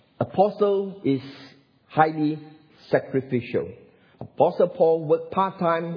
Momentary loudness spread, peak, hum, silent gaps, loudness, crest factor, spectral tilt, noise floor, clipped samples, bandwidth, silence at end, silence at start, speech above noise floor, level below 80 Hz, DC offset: 10 LU; -2 dBFS; none; none; -23 LUFS; 22 dB; -9.5 dB/octave; -44 dBFS; under 0.1%; 5.4 kHz; 0 s; 0.2 s; 21 dB; -66 dBFS; under 0.1%